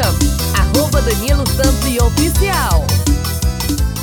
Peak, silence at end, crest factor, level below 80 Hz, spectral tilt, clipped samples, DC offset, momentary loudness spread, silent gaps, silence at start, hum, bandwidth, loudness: 0 dBFS; 0 s; 14 dB; -18 dBFS; -4.5 dB/octave; under 0.1%; under 0.1%; 4 LU; none; 0 s; none; over 20 kHz; -15 LUFS